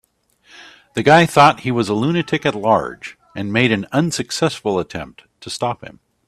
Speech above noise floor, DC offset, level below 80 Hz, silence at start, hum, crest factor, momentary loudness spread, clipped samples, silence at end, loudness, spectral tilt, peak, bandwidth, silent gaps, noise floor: 39 dB; under 0.1%; -54 dBFS; 0.6 s; none; 18 dB; 19 LU; under 0.1%; 0.35 s; -17 LUFS; -5 dB/octave; 0 dBFS; 14 kHz; none; -56 dBFS